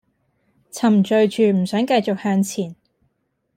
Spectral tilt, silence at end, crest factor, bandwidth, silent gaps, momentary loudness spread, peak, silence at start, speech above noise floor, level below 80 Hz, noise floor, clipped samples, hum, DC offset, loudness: -6 dB/octave; 0.85 s; 16 dB; 15.5 kHz; none; 11 LU; -6 dBFS; 0.75 s; 52 dB; -66 dBFS; -70 dBFS; under 0.1%; none; under 0.1%; -19 LUFS